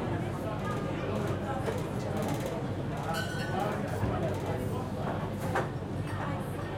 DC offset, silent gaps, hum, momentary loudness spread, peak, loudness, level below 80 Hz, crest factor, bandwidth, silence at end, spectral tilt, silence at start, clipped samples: under 0.1%; none; none; 3 LU; -18 dBFS; -33 LUFS; -50 dBFS; 14 dB; 16.5 kHz; 0 s; -6.5 dB/octave; 0 s; under 0.1%